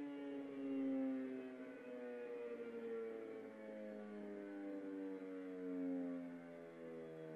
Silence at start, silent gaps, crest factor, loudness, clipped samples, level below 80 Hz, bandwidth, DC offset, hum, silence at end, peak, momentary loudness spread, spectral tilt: 0 s; none; 14 dB; -49 LUFS; under 0.1%; under -90 dBFS; 6.4 kHz; under 0.1%; none; 0 s; -34 dBFS; 10 LU; -7.5 dB/octave